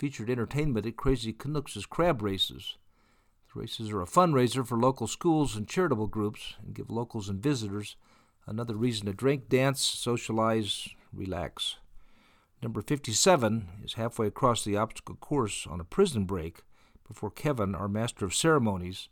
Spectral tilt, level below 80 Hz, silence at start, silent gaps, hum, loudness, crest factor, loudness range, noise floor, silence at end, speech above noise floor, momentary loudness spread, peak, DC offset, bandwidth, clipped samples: -5 dB/octave; -50 dBFS; 0 s; none; none; -29 LUFS; 20 dB; 4 LU; -66 dBFS; 0.05 s; 36 dB; 15 LU; -10 dBFS; under 0.1%; 19 kHz; under 0.1%